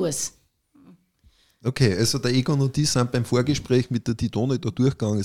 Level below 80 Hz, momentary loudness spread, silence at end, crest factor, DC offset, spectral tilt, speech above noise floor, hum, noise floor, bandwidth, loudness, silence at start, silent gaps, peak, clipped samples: -50 dBFS; 6 LU; 0 s; 18 dB; 0.3%; -5.5 dB/octave; 38 dB; none; -60 dBFS; 15.5 kHz; -23 LUFS; 0 s; none; -6 dBFS; under 0.1%